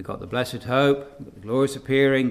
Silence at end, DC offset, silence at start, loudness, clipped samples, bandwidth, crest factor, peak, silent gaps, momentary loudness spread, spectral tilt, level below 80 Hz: 0 s; under 0.1%; 0 s; -23 LUFS; under 0.1%; 15 kHz; 16 dB; -6 dBFS; none; 10 LU; -6 dB/octave; -52 dBFS